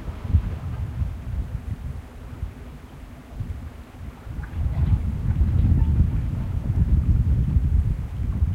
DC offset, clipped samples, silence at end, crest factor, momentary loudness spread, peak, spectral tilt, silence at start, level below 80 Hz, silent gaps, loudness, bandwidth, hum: under 0.1%; under 0.1%; 0 s; 16 dB; 19 LU; -6 dBFS; -9 dB/octave; 0 s; -26 dBFS; none; -25 LUFS; 4.7 kHz; none